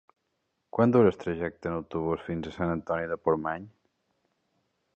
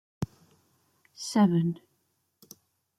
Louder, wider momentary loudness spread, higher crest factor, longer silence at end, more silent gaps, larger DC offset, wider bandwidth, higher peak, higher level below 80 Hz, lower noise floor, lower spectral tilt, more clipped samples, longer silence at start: about the same, -28 LUFS vs -28 LUFS; second, 12 LU vs 16 LU; about the same, 22 dB vs 18 dB; about the same, 1.3 s vs 1.25 s; neither; neither; second, 7.6 kHz vs 14.5 kHz; first, -8 dBFS vs -14 dBFS; first, -54 dBFS vs -64 dBFS; first, -79 dBFS vs -75 dBFS; first, -9 dB/octave vs -6.5 dB/octave; neither; first, 0.75 s vs 0.2 s